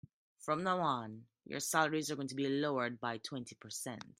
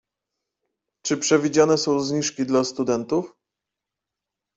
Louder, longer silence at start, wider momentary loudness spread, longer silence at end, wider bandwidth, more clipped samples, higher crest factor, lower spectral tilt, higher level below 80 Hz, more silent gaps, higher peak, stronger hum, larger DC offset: second, -37 LUFS vs -22 LUFS; second, 0.4 s vs 1.05 s; first, 13 LU vs 8 LU; second, 0.1 s vs 1.3 s; first, 15.5 kHz vs 8.2 kHz; neither; about the same, 22 dB vs 20 dB; about the same, -4 dB/octave vs -4 dB/octave; second, -80 dBFS vs -64 dBFS; neither; second, -16 dBFS vs -4 dBFS; neither; neither